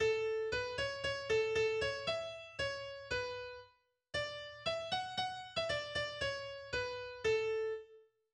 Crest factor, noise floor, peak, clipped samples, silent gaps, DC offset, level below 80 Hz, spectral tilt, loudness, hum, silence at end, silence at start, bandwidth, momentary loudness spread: 16 dB; -69 dBFS; -24 dBFS; under 0.1%; none; under 0.1%; -62 dBFS; -3 dB/octave; -38 LUFS; none; 0.35 s; 0 s; 10.5 kHz; 9 LU